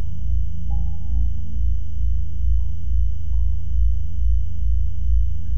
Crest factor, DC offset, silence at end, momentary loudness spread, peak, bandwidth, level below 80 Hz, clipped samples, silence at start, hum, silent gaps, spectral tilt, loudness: 10 dB; 20%; 0 s; 3 LU; -8 dBFS; 3.2 kHz; -22 dBFS; under 0.1%; 0 s; none; none; -9 dB/octave; -25 LUFS